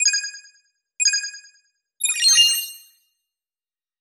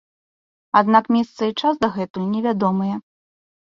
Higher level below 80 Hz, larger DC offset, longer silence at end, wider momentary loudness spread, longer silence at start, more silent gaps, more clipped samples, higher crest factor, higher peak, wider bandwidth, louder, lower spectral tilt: second, -84 dBFS vs -62 dBFS; neither; first, 1.25 s vs 0.8 s; first, 20 LU vs 9 LU; second, 0 s vs 0.75 s; second, none vs 2.10-2.14 s; neither; about the same, 18 dB vs 20 dB; about the same, -4 dBFS vs -2 dBFS; first, 18 kHz vs 7.4 kHz; first, -17 LUFS vs -20 LUFS; second, 9 dB/octave vs -7 dB/octave